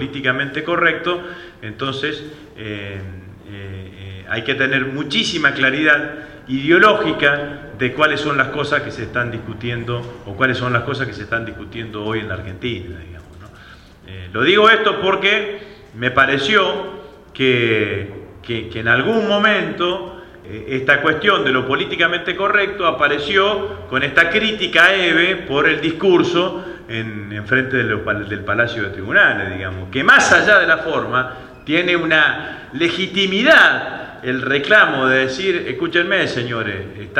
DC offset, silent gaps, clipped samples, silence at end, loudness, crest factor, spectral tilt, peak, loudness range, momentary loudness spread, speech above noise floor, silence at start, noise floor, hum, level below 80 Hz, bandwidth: under 0.1%; none; under 0.1%; 0 s; -16 LUFS; 18 dB; -4.5 dB/octave; 0 dBFS; 8 LU; 18 LU; 25 dB; 0 s; -42 dBFS; none; -48 dBFS; 12 kHz